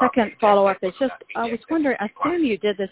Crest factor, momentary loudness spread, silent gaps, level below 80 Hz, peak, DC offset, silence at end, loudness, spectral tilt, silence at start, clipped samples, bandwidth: 18 dB; 9 LU; none; -58 dBFS; -4 dBFS; under 0.1%; 0.05 s; -22 LUFS; -9.5 dB/octave; 0 s; under 0.1%; 4 kHz